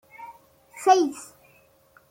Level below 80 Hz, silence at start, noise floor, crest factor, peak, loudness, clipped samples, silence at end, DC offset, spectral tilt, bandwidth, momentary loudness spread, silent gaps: -74 dBFS; 0.2 s; -59 dBFS; 20 dB; -6 dBFS; -22 LUFS; under 0.1%; 0.85 s; under 0.1%; -2.5 dB/octave; 16.5 kHz; 25 LU; none